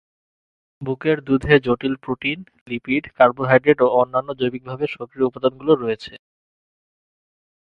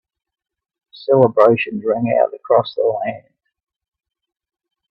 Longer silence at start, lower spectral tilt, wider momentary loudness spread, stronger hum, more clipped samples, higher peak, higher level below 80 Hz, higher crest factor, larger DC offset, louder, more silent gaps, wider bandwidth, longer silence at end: second, 0.8 s vs 0.95 s; about the same, -8 dB/octave vs -9 dB/octave; about the same, 13 LU vs 13 LU; neither; neither; about the same, 0 dBFS vs 0 dBFS; first, -50 dBFS vs -62 dBFS; about the same, 20 dB vs 18 dB; neither; second, -20 LUFS vs -16 LUFS; first, 2.61-2.66 s vs none; about the same, 5.8 kHz vs 5.6 kHz; second, 1.55 s vs 1.7 s